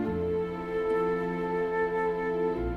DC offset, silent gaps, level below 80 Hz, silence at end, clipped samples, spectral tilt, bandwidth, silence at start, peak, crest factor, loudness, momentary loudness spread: under 0.1%; none; -46 dBFS; 0 s; under 0.1%; -8.5 dB/octave; 6 kHz; 0 s; -18 dBFS; 10 dB; -29 LUFS; 3 LU